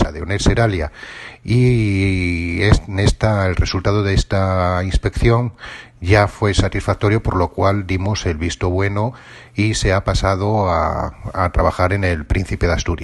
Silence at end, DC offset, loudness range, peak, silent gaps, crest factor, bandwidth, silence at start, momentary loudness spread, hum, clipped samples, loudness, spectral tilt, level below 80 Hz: 0 s; under 0.1%; 2 LU; 0 dBFS; none; 16 dB; 11.5 kHz; 0 s; 8 LU; none; under 0.1%; -18 LUFS; -6 dB/octave; -26 dBFS